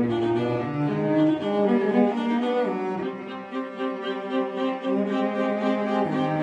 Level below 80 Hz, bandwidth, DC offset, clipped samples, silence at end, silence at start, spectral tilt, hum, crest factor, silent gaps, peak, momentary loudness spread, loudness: -66 dBFS; 8.6 kHz; under 0.1%; under 0.1%; 0 s; 0 s; -8 dB/octave; none; 16 dB; none; -8 dBFS; 8 LU; -25 LUFS